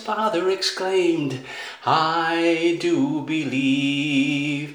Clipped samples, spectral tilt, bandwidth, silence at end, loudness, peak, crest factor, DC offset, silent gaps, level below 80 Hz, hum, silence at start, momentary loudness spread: under 0.1%; -5 dB/octave; 19 kHz; 0 s; -21 LUFS; -6 dBFS; 16 dB; under 0.1%; none; -74 dBFS; none; 0 s; 6 LU